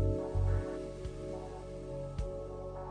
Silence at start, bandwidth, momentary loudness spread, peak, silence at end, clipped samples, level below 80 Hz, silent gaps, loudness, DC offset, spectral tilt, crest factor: 0 s; 10 kHz; 10 LU; -20 dBFS; 0 s; under 0.1%; -42 dBFS; none; -39 LUFS; under 0.1%; -8.5 dB/octave; 16 dB